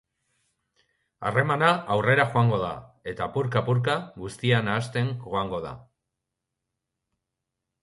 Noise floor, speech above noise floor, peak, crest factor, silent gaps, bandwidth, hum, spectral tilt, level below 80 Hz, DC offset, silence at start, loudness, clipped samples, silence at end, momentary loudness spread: -84 dBFS; 59 dB; -6 dBFS; 22 dB; none; 11.5 kHz; none; -6.5 dB/octave; -58 dBFS; under 0.1%; 1.2 s; -25 LUFS; under 0.1%; 2 s; 14 LU